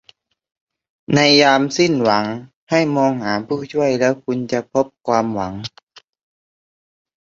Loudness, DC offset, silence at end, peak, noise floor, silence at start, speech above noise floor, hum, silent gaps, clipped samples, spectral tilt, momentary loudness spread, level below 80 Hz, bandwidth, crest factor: -17 LUFS; under 0.1%; 1.3 s; -2 dBFS; under -90 dBFS; 1.1 s; over 73 dB; none; 2.56-2.67 s, 5.83-5.87 s; under 0.1%; -4.5 dB/octave; 13 LU; -56 dBFS; 7.6 kHz; 18 dB